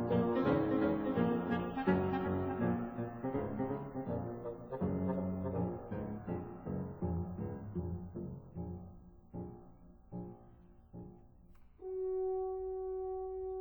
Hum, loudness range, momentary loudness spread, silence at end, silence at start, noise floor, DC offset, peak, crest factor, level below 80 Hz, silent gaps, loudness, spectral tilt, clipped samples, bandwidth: none; 14 LU; 17 LU; 0 s; 0 s; -59 dBFS; under 0.1%; -18 dBFS; 20 dB; -58 dBFS; none; -38 LUFS; -11 dB/octave; under 0.1%; over 20 kHz